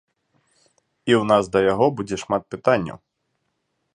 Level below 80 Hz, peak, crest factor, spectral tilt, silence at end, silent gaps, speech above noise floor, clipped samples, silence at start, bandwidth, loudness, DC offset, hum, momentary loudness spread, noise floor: -56 dBFS; -2 dBFS; 20 dB; -6 dB/octave; 1 s; none; 54 dB; under 0.1%; 1.05 s; 10 kHz; -20 LUFS; under 0.1%; none; 11 LU; -74 dBFS